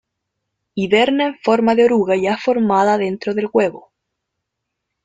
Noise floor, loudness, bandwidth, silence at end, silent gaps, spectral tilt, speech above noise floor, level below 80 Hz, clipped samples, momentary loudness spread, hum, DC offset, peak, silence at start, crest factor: -78 dBFS; -16 LUFS; 9.2 kHz; 1.25 s; none; -6 dB/octave; 62 dB; -60 dBFS; under 0.1%; 8 LU; none; under 0.1%; -2 dBFS; 0.75 s; 16 dB